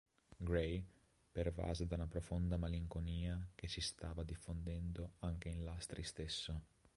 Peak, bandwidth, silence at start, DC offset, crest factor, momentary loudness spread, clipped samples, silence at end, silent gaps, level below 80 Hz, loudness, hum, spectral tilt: -24 dBFS; 11.5 kHz; 0.3 s; under 0.1%; 20 dB; 7 LU; under 0.1%; 0.3 s; none; -50 dBFS; -45 LUFS; none; -5.5 dB/octave